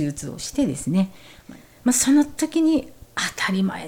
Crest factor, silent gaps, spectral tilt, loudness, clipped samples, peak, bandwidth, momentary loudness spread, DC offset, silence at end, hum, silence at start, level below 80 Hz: 16 dB; none; -4 dB/octave; -22 LUFS; under 0.1%; -6 dBFS; 18 kHz; 11 LU; under 0.1%; 0 s; none; 0 s; -50 dBFS